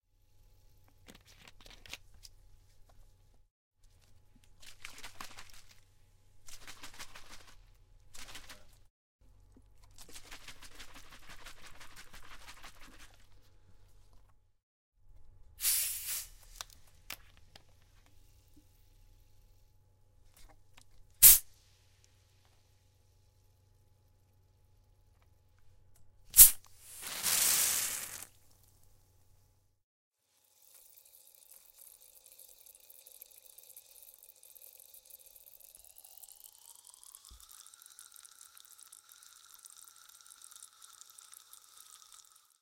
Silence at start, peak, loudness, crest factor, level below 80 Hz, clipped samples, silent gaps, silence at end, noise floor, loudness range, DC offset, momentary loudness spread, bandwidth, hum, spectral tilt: 1.9 s; -2 dBFS; -24 LUFS; 36 dB; -58 dBFS; under 0.1%; 3.51-3.71 s, 8.90-9.19 s, 14.63-14.92 s; 14.35 s; -72 dBFS; 28 LU; under 0.1%; 28 LU; 17 kHz; none; 1.5 dB/octave